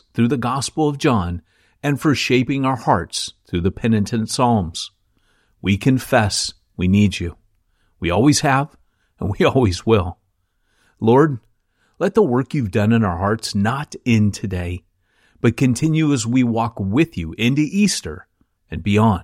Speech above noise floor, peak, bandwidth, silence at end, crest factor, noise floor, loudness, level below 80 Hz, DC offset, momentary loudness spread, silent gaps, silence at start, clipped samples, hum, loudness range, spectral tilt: 49 dB; -2 dBFS; 15.5 kHz; 0 s; 16 dB; -67 dBFS; -19 LUFS; -44 dBFS; under 0.1%; 11 LU; none; 0.15 s; under 0.1%; none; 2 LU; -5.5 dB/octave